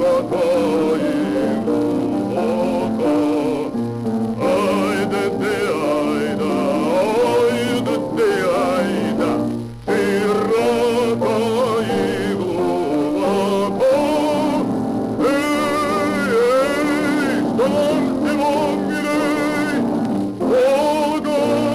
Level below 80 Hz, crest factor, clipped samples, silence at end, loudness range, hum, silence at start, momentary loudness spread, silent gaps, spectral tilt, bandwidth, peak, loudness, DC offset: -50 dBFS; 10 dB; under 0.1%; 0 s; 2 LU; none; 0 s; 4 LU; none; -6 dB/octave; 15.5 kHz; -8 dBFS; -18 LUFS; under 0.1%